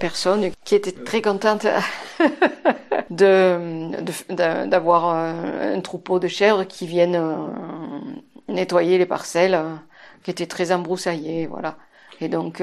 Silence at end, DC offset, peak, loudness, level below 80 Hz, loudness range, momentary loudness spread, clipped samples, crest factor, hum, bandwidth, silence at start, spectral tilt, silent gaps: 0 s; under 0.1%; -2 dBFS; -21 LUFS; -66 dBFS; 4 LU; 14 LU; under 0.1%; 18 dB; none; 13 kHz; 0 s; -5 dB/octave; none